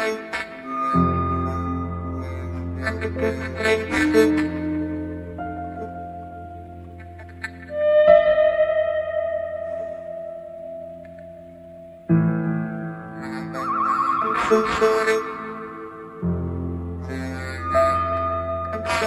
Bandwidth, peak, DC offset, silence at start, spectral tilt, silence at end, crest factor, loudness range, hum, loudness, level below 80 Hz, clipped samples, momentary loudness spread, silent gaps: 14 kHz; -2 dBFS; under 0.1%; 0 s; -6.5 dB/octave; 0 s; 20 dB; 7 LU; none; -23 LUFS; -44 dBFS; under 0.1%; 19 LU; none